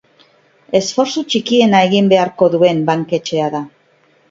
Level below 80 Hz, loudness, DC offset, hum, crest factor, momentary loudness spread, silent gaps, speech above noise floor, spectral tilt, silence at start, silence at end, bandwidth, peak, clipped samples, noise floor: -60 dBFS; -14 LUFS; under 0.1%; none; 14 dB; 7 LU; none; 41 dB; -5 dB/octave; 0.7 s; 0.6 s; 7.8 kHz; 0 dBFS; under 0.1%; -54 dBFS